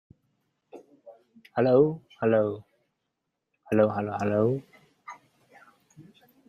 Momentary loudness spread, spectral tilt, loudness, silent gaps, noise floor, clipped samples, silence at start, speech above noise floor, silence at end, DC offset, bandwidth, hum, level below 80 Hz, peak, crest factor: 21 LU; -9 dB/octave; -26 LUFS; none; -82 dBFS; under 0.1%; 0.75 s; 58 dB; 0.45 s; under 0.1%; 11.5 kHz; none; -70 dBFS; -8 dBFS; 20 dB